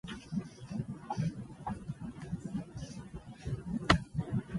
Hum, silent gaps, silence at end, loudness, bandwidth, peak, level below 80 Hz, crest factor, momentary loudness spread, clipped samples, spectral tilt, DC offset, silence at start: none; none; 0 s; -38 LUFS; 11.5 kHz; -10 dBFS; -50 dBFS; 28 dB; 15 LU; under 0.1%; -6 dB/octave; under 0.1%; 0.05 s